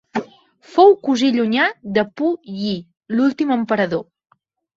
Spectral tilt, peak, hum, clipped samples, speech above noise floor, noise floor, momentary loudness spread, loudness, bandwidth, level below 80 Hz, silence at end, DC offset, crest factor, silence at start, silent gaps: -5.5 dB/octave; -2 dBFS; none; under 0.1%; 30 dB; -47 dBFS; 13 LU; -18 LUFS; 7.8 kHz; -62 dBFS; 0.75 s; under 0.1%; 18 dB; 0.15 s; none